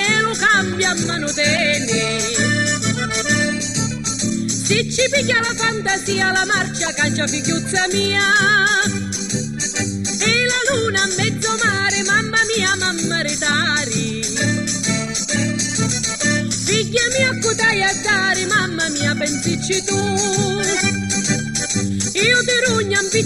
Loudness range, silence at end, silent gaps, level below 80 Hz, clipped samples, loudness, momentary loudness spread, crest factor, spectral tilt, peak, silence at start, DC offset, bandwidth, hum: 2 LU; 0 s; none; -46 dBFS; under 0.1%; -17 LUFS; 5 LU; 14 dB; -2.5 dB/octave; -4 dBFS; 0 s; 0.3%; 13 kHz; none